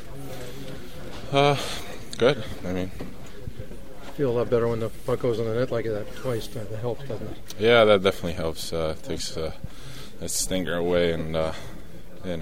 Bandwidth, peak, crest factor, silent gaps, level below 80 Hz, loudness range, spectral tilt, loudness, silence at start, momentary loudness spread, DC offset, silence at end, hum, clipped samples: 16 kHz; -4 dBFS; 22 dB; none; -44 dBFS; 4 LU; -4.5 dB/octave; -25 LUFS; 0 s; 19 LU; 2%; 0 s; none; under 0.1%